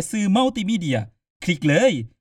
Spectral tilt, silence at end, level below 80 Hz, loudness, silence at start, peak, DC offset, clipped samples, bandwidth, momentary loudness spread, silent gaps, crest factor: -5.5 dB/octave; 0.15 s; -56 dBFS; -21 LUFS; 0 s; -6 dBFS; under 0.1%; under 0.1%; 14 kHz; 10 LU; 1.30-1.40 s; 16 dB